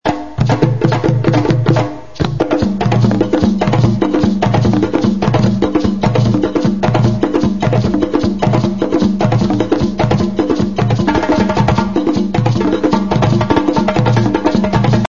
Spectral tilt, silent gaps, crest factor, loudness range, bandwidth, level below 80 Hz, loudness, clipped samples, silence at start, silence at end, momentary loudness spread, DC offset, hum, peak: -7.5 dB/octave; none; 12 dB; 1 LU; 7.4 kHz; -34 dBFS; -14 LUFS; under 0.1%; 0 s; 0 s; 2 LU; 3%; none; 0 dBFS